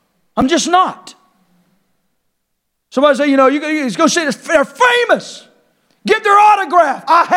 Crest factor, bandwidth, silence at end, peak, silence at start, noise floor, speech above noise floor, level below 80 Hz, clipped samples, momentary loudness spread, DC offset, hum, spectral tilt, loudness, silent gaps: 14 dB; 15.5 kHz; 0 s; 0 dBFS; 0.35 s; -70 dBFS; 58 dB; -52 dBFS; under 0.1%; 9 LU; under 0.1%; none; -3 dB/octave; -12 LUFS; none